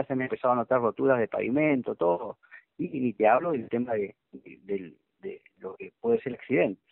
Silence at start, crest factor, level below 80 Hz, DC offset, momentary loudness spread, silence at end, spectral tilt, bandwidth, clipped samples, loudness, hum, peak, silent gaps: 0 s; 20 dB; -70 dBFS; under 0.1%; 17 LU; 0.15 s; -6.5 dB/octave; 4.1 kHz; under 0.1%; -27 LUFS; none; -8 dBFS; none